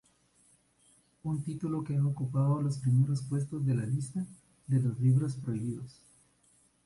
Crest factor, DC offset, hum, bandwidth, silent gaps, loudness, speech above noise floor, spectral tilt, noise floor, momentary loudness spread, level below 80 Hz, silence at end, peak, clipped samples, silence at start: 14 dB; under 0.1%; 60 Hz at -55 dBFS; 11.5 kHz; none; -31 LUFS; 37 dB; -8.5 dB/octave; -68 dBFS; 12 LU; -66 dBFS; 0.95 s; -18 dBFS; under 0.1%; 1.25 s